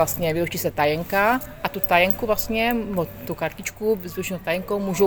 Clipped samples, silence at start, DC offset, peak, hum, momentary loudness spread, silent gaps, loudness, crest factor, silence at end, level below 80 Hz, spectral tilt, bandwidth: under 0.1%; 0 s; under 0.1%; -2 dBFS; none; 10 LU; none; -23 LUFS; 20 dB; 0 s; -46 dBFS; -4.5 dB/octave; over 20 kHz